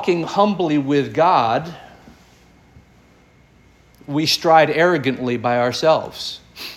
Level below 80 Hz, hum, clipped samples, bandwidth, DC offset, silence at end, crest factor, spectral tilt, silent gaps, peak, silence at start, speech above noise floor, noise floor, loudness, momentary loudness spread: -56 dBFS; none; under 0.1%; 16.5 kHz; under 0.1%; 0 s; 18 dB; -5 dB/octave; none; -2 dBFS; 0 s; 34 dB; -51 dBFS; -17 LUFS; 14 LU